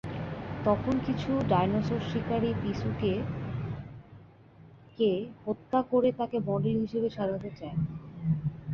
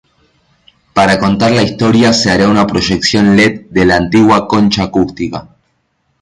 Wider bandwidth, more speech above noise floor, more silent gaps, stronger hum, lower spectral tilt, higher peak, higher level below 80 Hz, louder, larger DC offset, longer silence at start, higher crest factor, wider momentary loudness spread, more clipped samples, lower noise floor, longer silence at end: second, 7 kHz vs 11 kHz; second, 25 dB vs 52 dB; neither; neither; first, -8.5 dB/octave vs -5 dB/octave; second, -12 dBFS vs 0 dBFS; second, -52 dBFS vs -36 dBFS; second, -30 LUFS vs -10 LUFS; neither; second, 0.05 s vs 0.95 s; first, 18 dB vs 12 dB; first, 10 LU vs 7 LU; neither; second, -54 dBFS vs -62 dBFS; second, 0 s vs 0.8 s